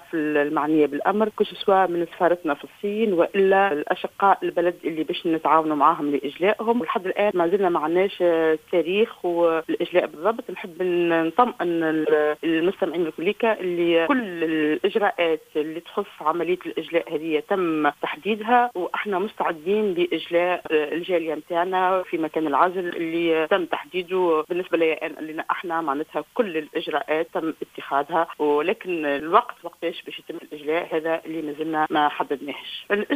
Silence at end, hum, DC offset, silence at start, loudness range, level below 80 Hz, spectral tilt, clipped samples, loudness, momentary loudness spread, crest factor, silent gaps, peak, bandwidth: 0 s; none; under 0.1%; 0.1 s; 4 LU; -66 dBFS; -6 dB/octave; under 0.1%; -23 LUFS; 8 LU; 20 dB; none; -2 dBFS; 16 kHz